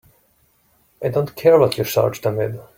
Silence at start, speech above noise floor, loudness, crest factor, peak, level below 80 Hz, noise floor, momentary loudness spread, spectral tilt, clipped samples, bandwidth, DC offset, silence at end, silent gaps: 1 s; 43 dB; -18 LUFS; 18 dB; -2 dBFS; -56 dBFS; -60 dBFS; 10 LU; -6 dB/octave; under 0.1%; 16.5 kHz; under 0.1%; 0.15 s; none